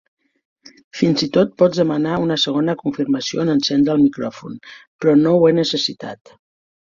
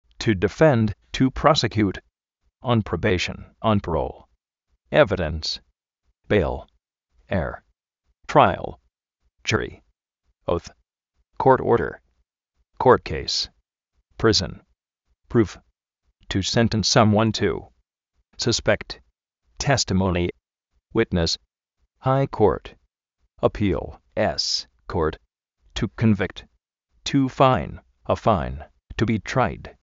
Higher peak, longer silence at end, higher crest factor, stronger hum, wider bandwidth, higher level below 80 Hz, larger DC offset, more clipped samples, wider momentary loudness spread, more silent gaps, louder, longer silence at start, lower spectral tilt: about the same, -2 dBFS vs -2 dBFS; first, 0.7 s vs 0.15 s; second, 16 dB vs 22 dB; neither; about the same, 7.6 kHz vs 8 kHz; second, -56 dBFS vs -42 dBFS; neither; neither; first, 17 LU vs 14 LU; first, 4.87-4.99 s vs none; first, -17 LUFS vs -22 LUFS; first, 0.95 s vs 0.2 s; first, -6 dB/octave vs -4.5 dB/octave